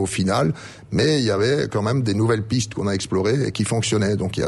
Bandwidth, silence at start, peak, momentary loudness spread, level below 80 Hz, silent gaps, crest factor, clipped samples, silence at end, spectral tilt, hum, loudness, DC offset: 11.5 kHz; 0 s; -8 dBFS; 5 LU; -48 dBFS; none; 14 dB; under 0.1%; 0 s; -5.5 dB/octave; none; -21 LUFS; under 0.1%